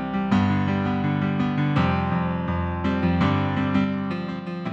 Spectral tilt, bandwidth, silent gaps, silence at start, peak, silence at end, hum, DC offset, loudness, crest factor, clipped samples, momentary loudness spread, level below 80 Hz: -8.5 dB/octave; 7.4 kHz; none; 0 s; -8 dBFS; 0 s; none; under 0.1%; -23 LUFS; 14 dB; under 0.1%; 6 LU; -44 dBFS